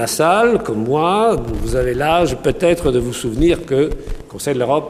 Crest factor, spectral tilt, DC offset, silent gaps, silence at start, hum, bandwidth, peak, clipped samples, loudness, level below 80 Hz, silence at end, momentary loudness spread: 16 dB; -5.5 dB/octave; under 0.1%; none; 0 s; none; 15.5 kHz; 0 dBFS; under 0.1%; -16 LUFS; -30 dBFS; 0 s; 7 LU